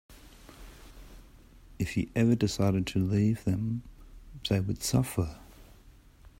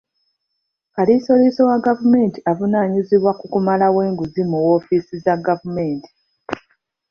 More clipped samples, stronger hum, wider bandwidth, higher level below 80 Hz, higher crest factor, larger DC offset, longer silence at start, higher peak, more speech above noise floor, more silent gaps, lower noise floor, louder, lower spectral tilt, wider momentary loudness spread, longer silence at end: neither; neither; first, 16 kHz vs 6.6 kHz; first, -50 dBFS vs -58 dBFS; about the same, 18 dB vs 16 dB; neither; second, 0.1 s vs 0.95 s; second, -12 dBFS vs -2 dBFS; second, 27 dB vs 59 dB; neither; second, -55 dBFS vs -76 dBFS; second, -30 LUFS vs -17 LUFS; second, -6 dB/octave vs -9 dB/octave; first, 24 LU vs 12 LU; about the same, 0.5 s vs 0.5 s